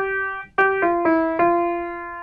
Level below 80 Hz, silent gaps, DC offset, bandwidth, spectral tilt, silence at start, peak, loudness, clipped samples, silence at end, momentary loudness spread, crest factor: -52 dBFS; none; under 0.1%; 5 kHz; -7.5 dB/octave; 0 s; -6 dBFS; -20 LUFS; under 0.1%; 0 s; 7 LU; 14 dB